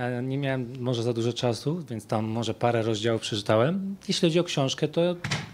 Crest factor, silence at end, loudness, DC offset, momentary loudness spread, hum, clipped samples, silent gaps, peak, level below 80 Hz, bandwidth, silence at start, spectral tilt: 18 dB; 0 s; -27 LUFS; under 0.1%; 7 LU; none; under 0.1%; none; -8 dBFS; -62 dBFS; 15 kHz; 0 s; -5.5 dB/octave